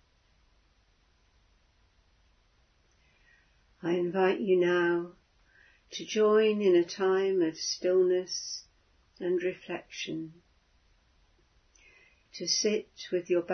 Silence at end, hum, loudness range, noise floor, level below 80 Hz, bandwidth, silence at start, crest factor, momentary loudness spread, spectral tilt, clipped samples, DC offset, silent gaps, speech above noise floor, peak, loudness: 0 s; none; 11 LU; -67 dBFS; -70 dBFS; 6.6 kHz; 3.85 s; 18 dB; 15 LU; -4 dB/octave; under 0.1%; under 0.1%; none; 39 dB; -12 dBFS; -29 LUFS